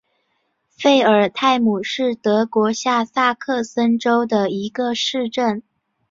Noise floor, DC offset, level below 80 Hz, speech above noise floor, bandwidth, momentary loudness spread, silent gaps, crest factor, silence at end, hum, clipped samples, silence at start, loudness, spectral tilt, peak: -69 dBFS; under 0.1%; -64 dBFS; 51 dB; 7.6 kHz; 7 LU; none; 18 dB; 0.5 s; none; under 0.1%; 0.8 s; -18 LUFS; -4.5 dB/octave; -2 dBFS